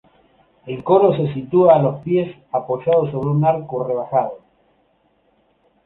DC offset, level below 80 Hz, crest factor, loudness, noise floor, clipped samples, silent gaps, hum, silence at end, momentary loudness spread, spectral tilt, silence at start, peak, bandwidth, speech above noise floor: under 0.1%; -58 dBFS; 16 dB; -18 LUFS; -61 dBFS; under 0.1%; none; none; 1.5 s; 11 LU; -11.5 dB/octave; 0.65 s; -2 dBFS; 4.1 kHz; 44 dB